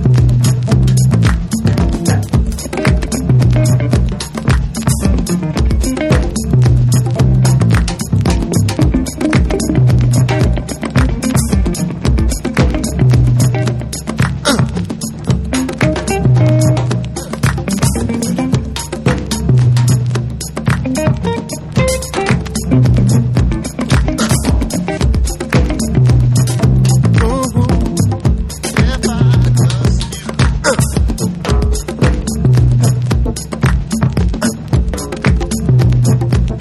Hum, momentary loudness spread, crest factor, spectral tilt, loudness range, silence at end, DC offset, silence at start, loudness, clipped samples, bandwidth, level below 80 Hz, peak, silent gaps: none; 7 LU; 12 dB; -6 dB/octave; 2 LU; 0 s; under 0.1%; 0 s; -14 LUFS; under 0.1%; 13.5 kHz; -20 dBFS; 0 dBFS; none